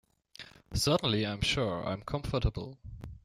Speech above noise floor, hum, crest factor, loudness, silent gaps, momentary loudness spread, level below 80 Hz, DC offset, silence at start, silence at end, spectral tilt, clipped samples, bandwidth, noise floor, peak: 22 dB; none; 18 dB; -31 LUFS; none; 20 LU; -46 dBFS; under 0.1%; 0.4 s; 0.05 s; -4.5 dB/octave; under 0.1%; 16 kHz; -53 dBFS; -16 dBFS